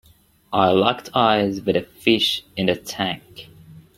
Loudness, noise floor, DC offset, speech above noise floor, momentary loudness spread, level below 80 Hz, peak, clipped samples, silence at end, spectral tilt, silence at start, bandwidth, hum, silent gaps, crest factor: -20 LUFS; -51 dBFS; under 0.1%; 31 dB; 8 LU; -56 dBFS; 0 dBFS; under 0.1%; 0.2 s; -5 dB/octave; 0.5 s; 16.5 kHz; none; none; 20 dB